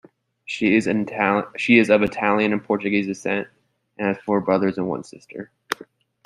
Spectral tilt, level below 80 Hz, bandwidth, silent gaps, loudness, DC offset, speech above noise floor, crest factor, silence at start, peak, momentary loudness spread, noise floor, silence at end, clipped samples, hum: -6 dB/octave; -60 dBFS; 13.5 kHz; none; -21 LUFS; under 0.1%; 27 dB; 20 dB; 0.5 s; -2 dBFS; 18 LU; -47 dBFS; 0.4 s; under 0.1%; none